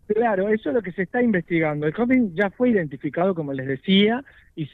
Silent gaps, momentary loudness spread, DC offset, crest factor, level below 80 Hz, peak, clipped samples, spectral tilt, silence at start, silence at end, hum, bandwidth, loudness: none; 9 LU; under 0.1%; 14 dB; -58 dBFS; -8 dBFS; under 0.1%; -9 dB/octave; 0.1 s; 0.05 s; none; 4.3 kHz; -22 LUFS